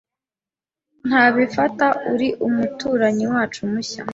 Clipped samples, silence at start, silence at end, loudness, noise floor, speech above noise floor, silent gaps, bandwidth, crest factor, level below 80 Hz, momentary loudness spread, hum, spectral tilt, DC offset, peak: under 0.1%; 1.05 s; 0 s; -19 LUFS; under -90 dBFS; over 71 dB; none; 8 kHz; 18 dB; -58 dBFS; 9 LU; none; -5 dB/octave; under 0.1%; -2 dBFS